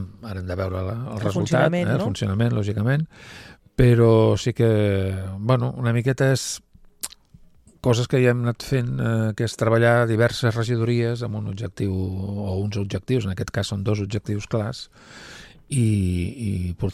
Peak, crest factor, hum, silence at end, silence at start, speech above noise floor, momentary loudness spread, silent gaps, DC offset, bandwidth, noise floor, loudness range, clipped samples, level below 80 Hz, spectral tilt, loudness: -4 dBFS; 18 dB; none; 0 s; 0 s; 30 dB; 15 LU; none; under 0.1%; 13.5 kHz; -51 dBFS; 6 LU; under 0.1%; -44 dBFS; -6.5 dB/octave; -22 LUFS